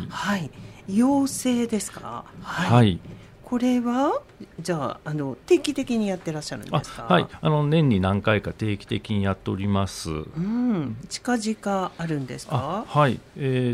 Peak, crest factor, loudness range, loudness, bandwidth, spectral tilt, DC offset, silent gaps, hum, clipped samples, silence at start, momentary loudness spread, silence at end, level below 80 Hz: -4 dBFS; 20 dB; 3 LU; -24 LUFS; 15.5 kHz; -6 dB/octave; under 0.1%; none; none; under 0.1%; 0 s; 11 LU; 0 s; -52 dBFS